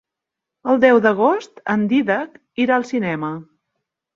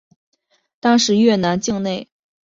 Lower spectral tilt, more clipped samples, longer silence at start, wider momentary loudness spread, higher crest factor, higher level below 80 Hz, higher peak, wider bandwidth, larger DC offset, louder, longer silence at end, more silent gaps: first, -6.5 dB/octave vs -4.5 dB/octave; neither; second, 0.65 s vs 0.85 s; first, 15 LU vs 10 LU; about the same, 18 dB vs 16 dB; second, -64 dBFS vs -56 dBFS; about the same, -2 dBFS vs -2 dBFS; about the same, 7.6 kHz vs 7.8 kHz; neither; about the same, -18 LUFS vs -17 LUFS; first, 0.7 s vs 0.4 s; neither